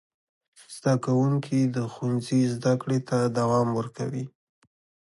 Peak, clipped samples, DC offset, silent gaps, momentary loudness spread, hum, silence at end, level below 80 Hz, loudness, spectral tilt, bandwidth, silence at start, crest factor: -10 dBFS; under 0.1%; under 0.1%; none; 9 LU; none; 0.8 s; -64 dBFS; -26 LUFS; -7 dB/octave; 11.5 kHz; 0.7 s; 16 dB